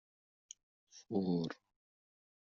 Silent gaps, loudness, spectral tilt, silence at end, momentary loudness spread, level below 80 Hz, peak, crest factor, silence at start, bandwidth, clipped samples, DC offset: none; -39 LUFS; -7 dB/octave; 1 s; 23 LU; -80 dBFS; -24 dBFS; 20 dB; 0.95 s; 7.4 kHz; under 0.1%; under 0.1%